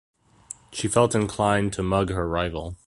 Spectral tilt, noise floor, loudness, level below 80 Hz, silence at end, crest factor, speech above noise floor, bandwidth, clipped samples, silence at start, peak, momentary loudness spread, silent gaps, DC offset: -5 dB/octave; -45 dBFS; -24 LUFS; -42 dBFS; 0.1 s; 20 dB; 22 dB; 11.5 kHz; under 0.1%; 0.7 s; -4 dBFS; 14 LU; none; under 0.1%